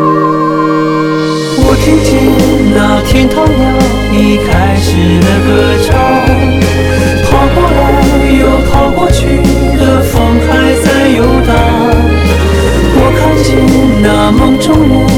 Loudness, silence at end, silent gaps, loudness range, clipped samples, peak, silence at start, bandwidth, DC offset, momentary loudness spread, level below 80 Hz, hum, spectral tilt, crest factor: -8 LUFS; 0 s; none; 0 LU; 1%; 0 dBFS; 0 s; 18 kHz; under 0.1%; 2 LU; -16 dBFS; none; -6 dB/octave; 6 dB